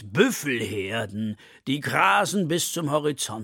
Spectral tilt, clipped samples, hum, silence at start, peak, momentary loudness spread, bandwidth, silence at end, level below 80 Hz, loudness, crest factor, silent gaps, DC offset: -4 dB/octave; under 0.1%; none; 0 s; -4 dBFS; 11 LU; 17.5 kHz; 0 s; -66 dBFS; -24 LUFS; 22 dB; none; under 0.1%